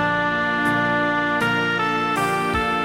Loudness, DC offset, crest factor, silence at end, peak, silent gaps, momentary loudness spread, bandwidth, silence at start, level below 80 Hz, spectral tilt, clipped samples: -20 LUFS; 0.1%; 12 dB; 0 s; -8 dBFS; none; 1 LU; 16 kHz; 0 s; -44 dBFS; -5 dB/octave; under 0.1%